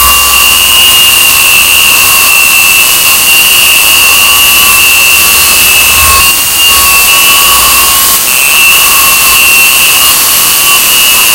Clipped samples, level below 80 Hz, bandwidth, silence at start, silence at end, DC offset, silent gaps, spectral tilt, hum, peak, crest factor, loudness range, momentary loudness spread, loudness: 20%; -28 dBFS; over 20 kHz; 0 s; 0 s; under 0.1%; none; 1.5 dB/octave; none; 0 dBFS; 4 dB; 1 LU; 2 LU; -1 LUFS